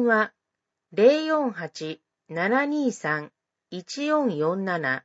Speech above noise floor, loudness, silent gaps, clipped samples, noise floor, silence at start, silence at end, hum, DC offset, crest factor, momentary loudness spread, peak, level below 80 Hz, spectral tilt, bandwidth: 60 dB; -24 LUFS; none; under 0.1%; -84 dBFS; 0 s; 0.05 s; none; under 0.1%; 20 dB; 16 LU; -6 dBFS; -80 dBFS; -5.5 dB/octave; 8 kHz